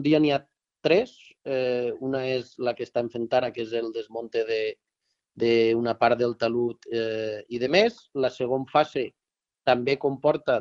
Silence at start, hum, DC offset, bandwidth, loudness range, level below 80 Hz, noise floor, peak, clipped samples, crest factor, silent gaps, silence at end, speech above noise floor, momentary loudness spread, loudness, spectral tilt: 0 s; none; under 0.1%; 7.4 kHz; 4 LU; -66 dBFS; -73 dBFS; -8 dBFS; under 0.1%; 18 dB; none; 0 s; 48 dB; 9 LU; -26 LUFS; -6.5 dB/octave